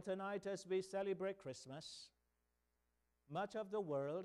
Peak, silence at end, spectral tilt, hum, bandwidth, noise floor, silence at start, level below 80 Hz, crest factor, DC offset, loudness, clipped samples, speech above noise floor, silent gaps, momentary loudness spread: -32 dBFS; 0 s; -5.5 dB/octave; 60 Hz at -85 dBFS; 12 kHz; -86 dBFS; 0 s; -84 dBFS; 14 dB; under 0.1%; -46 LUFS; under 0.1%; 41 dB; none; 10 LU